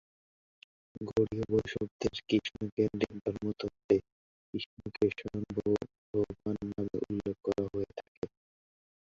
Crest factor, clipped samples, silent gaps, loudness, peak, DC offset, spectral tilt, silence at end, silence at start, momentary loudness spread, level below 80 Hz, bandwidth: 22 dB; under 0.1%; 1.91-1.99 s, 2.72-2.77 s, 3.21-3.25 s, 3.84-3.89 s, 4.12-4.53 s, 4.66-4.77 s, 5.98-6.14 s, 8.08-8.22 s; -35 LUFS; -12 dBFS; under 0.1%; -7 dB/octave; 0.9 s; 0.95 s; 11 LU; -58 dBFS; 7.6 kHz